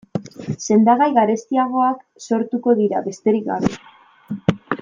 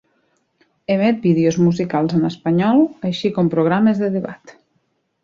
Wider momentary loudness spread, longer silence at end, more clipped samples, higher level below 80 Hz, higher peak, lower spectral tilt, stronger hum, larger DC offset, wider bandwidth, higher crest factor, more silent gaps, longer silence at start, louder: first, 15 LU vs 7 LU; second, 0.05 s vs 0.9 s; neither; first, -52 dBFS vs -58 dBFS; about the same, -2 dBFS vs -4 dBFS; about the same, -6.5 dB/octave vs -7.5 dB/octave; neither; neither; about the same, 7.6 kHz vs 7.4 kHz; about the same, 16 dB vs 14 dB; neither; second, 0.15 s vs 0.9 s; about the same, -19 LUFS vs -17 LUFS